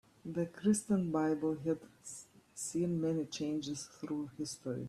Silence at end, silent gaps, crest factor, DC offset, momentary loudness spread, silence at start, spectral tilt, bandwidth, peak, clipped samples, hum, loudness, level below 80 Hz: 0 s; none; 18 dB; under 0.1%; 14 LU; 0.25 s; -5.5 dB/octave; 13.5 kHz; -20 dBFS; under 0.1%; none; -36 LUFS; -72 dBFS